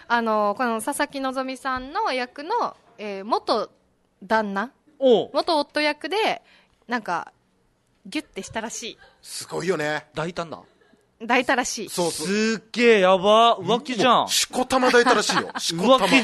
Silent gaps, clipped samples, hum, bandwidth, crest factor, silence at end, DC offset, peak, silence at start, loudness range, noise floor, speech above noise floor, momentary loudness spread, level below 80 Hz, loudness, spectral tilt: none; under 0.1%; none; 12.5 kHz; 20 dB; 0 s; under 0.1%; -4 dBFS; 0.1 s; 11 LU; -65 dBFS; 43 dB; 16 LU; -60 dBFS; -22 LUFS; -3 dB/octave